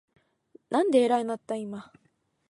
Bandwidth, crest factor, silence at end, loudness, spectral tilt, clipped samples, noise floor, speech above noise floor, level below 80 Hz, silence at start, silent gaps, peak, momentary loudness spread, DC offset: 11.5 kHz; 18 dB; 0.7 s; -26 LUFS; -5 dB/octave; under 0.1%; -59 dBFS; 33 dB; -80 dBFS; 0.7 s; none; -10 dBFS; 15 LU; under 0.1%